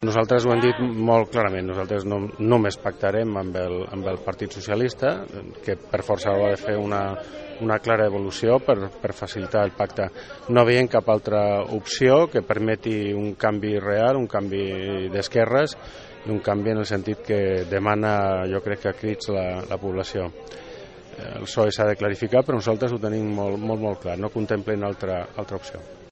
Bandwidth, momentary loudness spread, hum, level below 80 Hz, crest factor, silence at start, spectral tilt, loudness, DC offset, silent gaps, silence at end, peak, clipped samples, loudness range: 8.4 kHz; 12 LU; none; -52 dBFS; 20 dB; 0 s; -6.5 dB/octave; -23 LUFS; under 0.1%; none; 0 s; -2 dBFS; under 0.1%; 6 LU